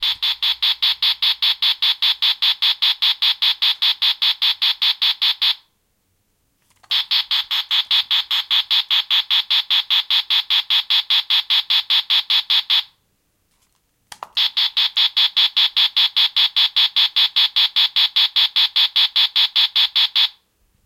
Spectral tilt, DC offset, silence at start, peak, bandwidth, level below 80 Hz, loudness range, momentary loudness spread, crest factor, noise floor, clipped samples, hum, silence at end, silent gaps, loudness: 4 dB/octave; under 0.1%; 0 s; -4 dBFS; 16.5 kHz; -68 dBFS; 4 LU; 3 LU; 16 dB; -66 dBFS; under 0.1%; none; 0.55 s; none; -15 LUFS